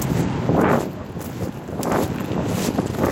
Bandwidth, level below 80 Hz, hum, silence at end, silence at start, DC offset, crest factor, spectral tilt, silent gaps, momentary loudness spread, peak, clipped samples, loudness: 17 kHz; -40 dBFS; none; 0 s; 0 s; under 0.1%; 16 dB; -6.5 dB/octave; none; 11 LU; -6 dBFS; under 0.1%; -23 LUFS